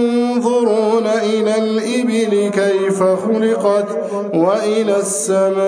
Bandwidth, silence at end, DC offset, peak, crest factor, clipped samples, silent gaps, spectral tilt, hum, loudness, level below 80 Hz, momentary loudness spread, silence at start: 10.5 kHz; 0 s; under 0.1%; -2 dBFS; 12 dB; under 0.1%; none; -5 dB/octave; none; -16 LUFS; -72 dBFS; 2 LU; 0 s